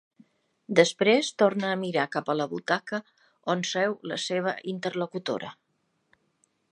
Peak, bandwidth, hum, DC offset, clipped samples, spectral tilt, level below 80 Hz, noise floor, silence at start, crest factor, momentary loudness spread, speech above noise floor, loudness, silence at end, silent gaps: -4 dBFS; 11 kHz; none; under 0.1%; under 0.1%; -4 dB/octave; -80 dBFS; -74 dBFS; 0.7 s; 24 dB; 11 LU; 48 dB; -27 LUFS; 1.2 s; none